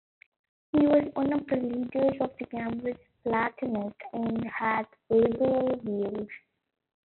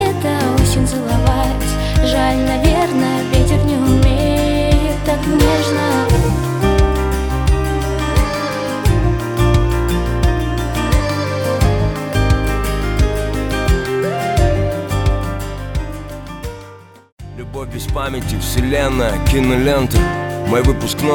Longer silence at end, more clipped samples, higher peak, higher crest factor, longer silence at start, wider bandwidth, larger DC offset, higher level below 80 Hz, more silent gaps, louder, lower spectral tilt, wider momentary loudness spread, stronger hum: first, 0.65 s vs 0 s; neither; second, -12 dBFS vs 0 dBFS; about the same, 16 dB vs 14 dB; first, 0.75 s vs 0 s; second, 4.3 kHz vs 19.5 kHz; neither; second, -62 dBFS vs -20 dBFS; second, none vs 17.12-17.17 s; second, -29 LUFS vs -16 LUFS; about the same, -6 dB/octave vs -6 dB/octave; first, 12 LU vs 8 LU; neither